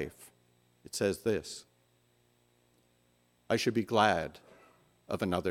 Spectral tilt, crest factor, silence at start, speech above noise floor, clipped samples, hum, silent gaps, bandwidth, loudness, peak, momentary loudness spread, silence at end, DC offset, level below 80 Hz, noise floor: -4.5 dB/octave; 24 dB; 0 s; 39 dB; under 0.1%; 60 Hz at -65 dBFS; none; 17 kHz; -32 LUFS; -10 dBFS; 16 LU; 0 s; under 0.1%; -68 dBFS; -70 dBFS